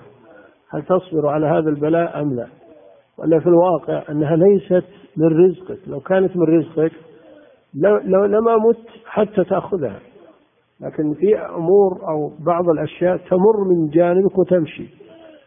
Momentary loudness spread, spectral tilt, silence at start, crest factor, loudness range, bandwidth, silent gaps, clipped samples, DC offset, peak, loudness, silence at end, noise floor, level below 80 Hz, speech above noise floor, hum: 14 LU; -13 dB/octave; 0.7 s; 16 dB; 3 LU; 3.7 kHz; none; under 0.1%; under 0.1%; -2 dBFS; -17 LUFS; 0.6 s; -55 dBFS; -58 dBFS; 39 dB; none